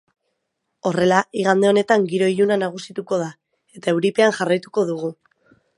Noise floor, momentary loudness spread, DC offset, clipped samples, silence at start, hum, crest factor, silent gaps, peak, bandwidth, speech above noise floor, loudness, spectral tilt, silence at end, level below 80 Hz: -76 dBFS; 11 LU; under 0.1%; under 0.1%; 0.85 s; none; 20 dB; none; 0 dBFS; 11.5 kHz; 57 dB; -19 LUFS; -5.5 dB/octave; 0.65 s; -66 dBFS